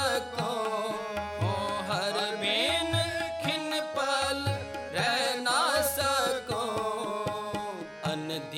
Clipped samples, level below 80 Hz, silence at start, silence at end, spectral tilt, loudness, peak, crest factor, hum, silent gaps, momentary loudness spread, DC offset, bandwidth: under 0.1%; -56 dBFS; 0 s; 0 s; -3.5 dB/octave; -29 LUFS; -14 dBFS; 16 dB; none; none; 8 LU; under 0.1%; 16 kHz